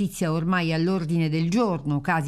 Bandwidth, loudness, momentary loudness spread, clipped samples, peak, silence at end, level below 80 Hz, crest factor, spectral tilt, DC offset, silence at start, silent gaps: 13.5 kHz; -24 LUFS; 3 LU; under 0.1%; -10 dBFS; 0 s; -52 dBFS; 14 dB; -6.5 dB/octave; under 0.1%; 0 s; none